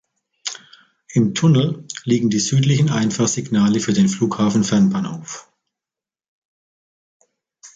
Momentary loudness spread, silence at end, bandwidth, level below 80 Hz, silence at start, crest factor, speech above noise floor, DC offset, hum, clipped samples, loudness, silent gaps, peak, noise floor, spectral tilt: 14 LU; 0.1 s; 9.2 kHz; -56 dBFS; 0.45 s; 16 dB; 73 dB; under 0.1%; none; under 0.1%; -18 LUFS; 6.28-7.20 s; -4 dBFS; -90 dBFS; -5.5 dB/octave